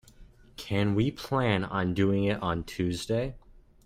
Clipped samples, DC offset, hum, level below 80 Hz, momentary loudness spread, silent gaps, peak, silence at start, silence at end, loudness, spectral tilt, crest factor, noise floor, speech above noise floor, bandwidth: under 0.1%; under 0.1%; none; -50 dBFS; 7 LU; none; -12 dBFS; 0.2 s; 0.45 s; -29 LUFS; -6.5 dB/octave; 18 dB; -53 dBFS; 25 dB; 16 kHz